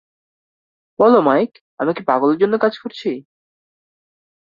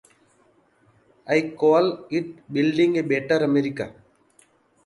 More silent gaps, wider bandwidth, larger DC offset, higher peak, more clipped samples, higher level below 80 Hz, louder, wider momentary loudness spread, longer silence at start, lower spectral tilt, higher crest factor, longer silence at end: first, 1.61-1.77 s vs none; second, 7.2 kHz vs 11 kHz; neither; first, -2 dBFS vs -6 dBFS; neither; about the same, -66 dBFS vs -66 dBFS; first, -17 LUFS vs -22 LUFS; about the same, 13 LU vs 11 LU; second, 1 s vs 1.25 s; first, -8 dB/octave vs -6.5 dB/octave; about the same, 18 dB vs 18 dB; first, 1.2 s vs 0.95 s